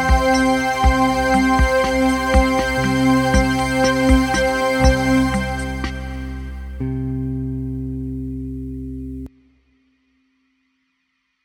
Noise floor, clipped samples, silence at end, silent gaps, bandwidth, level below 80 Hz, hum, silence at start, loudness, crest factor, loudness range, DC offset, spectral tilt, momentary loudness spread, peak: -70 dBFS; under 0.1%; 2.15 s; none; 16.5 kHz; -26 dBFS; none; 0 s; -18 LUFS; 18 dB; 14 LU; under 0.1%; -5.5 dB/octave; 14 LU; -2 dBFS